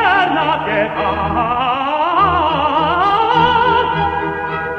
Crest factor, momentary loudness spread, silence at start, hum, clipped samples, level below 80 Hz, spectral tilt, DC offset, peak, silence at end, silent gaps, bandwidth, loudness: 14 dB; 5 LU; 0 s; none; under 0.1%; -40 dBFS; -6.5 dB/octave; under 0.1%; -2 dBFS; 0 s; none; 8 kHz; -15 LUFS